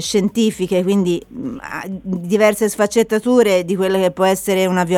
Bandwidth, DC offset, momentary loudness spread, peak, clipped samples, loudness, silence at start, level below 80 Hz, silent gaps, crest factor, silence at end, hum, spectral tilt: 17.5 kHz; under 0.1%; 12 LU; -2 dBFS; under 0.1%; -17 LUFS; 0 s; -50 dBFS; none; 14 dB; 0 s; none; -5 dB/octave